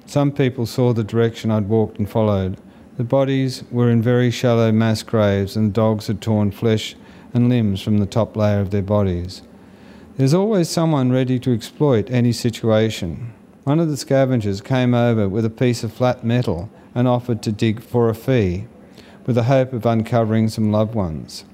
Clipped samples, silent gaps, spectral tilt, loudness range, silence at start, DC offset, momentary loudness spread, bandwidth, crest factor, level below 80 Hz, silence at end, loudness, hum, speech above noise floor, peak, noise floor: under 0.1%; none; -7 dB/octave; 2 LU; 0.1 s; under 0.1%; 9 LU; 15.5 kHz; 16 dB; -50 dBFS; 0.1 s; -19 LUFS; none; 25 dB; -4 dBFS; -43 dBFS